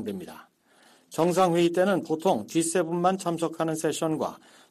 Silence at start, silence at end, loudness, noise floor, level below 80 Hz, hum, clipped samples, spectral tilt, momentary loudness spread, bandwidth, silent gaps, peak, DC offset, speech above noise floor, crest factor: 0 s; 0.35 s; -26 LUFS; -59 dBFS; -70 dBFS; none; under 0.1%; -5 dB/octave; 12 LU; 14.5 kHz; none; -10 dBFS; under 0.1%; 33 dB; 16 dB